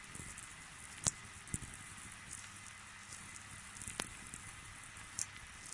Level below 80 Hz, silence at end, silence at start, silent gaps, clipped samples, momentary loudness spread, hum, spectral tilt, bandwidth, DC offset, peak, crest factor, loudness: -62 dBFS; 0 s; 0 s; none; under 0.1%; 12 LU; none; -1.5 dB/octave; 11.5 kHz; under 0.1%; -10 dBFS; 38 dB; -45 LUFS